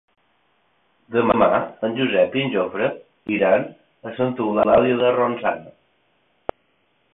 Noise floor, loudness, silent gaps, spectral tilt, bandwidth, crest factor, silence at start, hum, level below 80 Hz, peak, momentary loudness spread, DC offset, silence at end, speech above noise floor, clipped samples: -65 dBFS; -20 LUFS; none; -10.5 dB/octave; 4 kHz; 18 dB; 1.1 s; none; -56 dBFS; -4 dBFS; 18 LU; under 0.1%; 1.45 s; 46 dB; under 0.1%